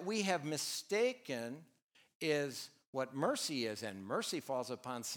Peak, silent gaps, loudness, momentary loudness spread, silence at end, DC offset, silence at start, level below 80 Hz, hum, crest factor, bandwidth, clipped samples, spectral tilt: -18 dBFS; 1.82-1.89 s, 2.15-2.20 s, 2.87-2.93 s; -39 LUFS; 9 LU; 0 s; under 0.1%; 0 s; -90 dBFS; none; 22 dB; over 20 kHz; under 0.1%; -3.5 dB/octave